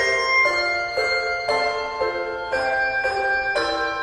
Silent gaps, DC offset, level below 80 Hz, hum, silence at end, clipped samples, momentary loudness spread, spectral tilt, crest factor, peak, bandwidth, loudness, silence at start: none; under 0.1%; -50 dBFS; none; 0 s; under 0.1%; 8 LU; -2 dB/octave; 14 dB; -8 dBFS; 12.5 kHz; -21 LUFS; 0 s